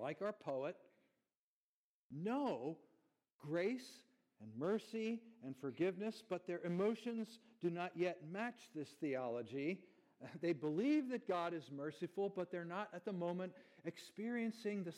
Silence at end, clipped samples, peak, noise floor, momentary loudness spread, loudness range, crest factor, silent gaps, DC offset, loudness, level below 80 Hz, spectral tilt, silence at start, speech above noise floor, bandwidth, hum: 0 s; under 0.1%; -26 dBFS; under -90 dBFS; 12 LU; 4 LU; 18 dB; 1.37-2.10 s, 3.32-3.39 s; under 0.1%; -44 LUFS; under -90 dBFS; -7 dB/octave; 0 s; over 47 dB; 14 kHz; none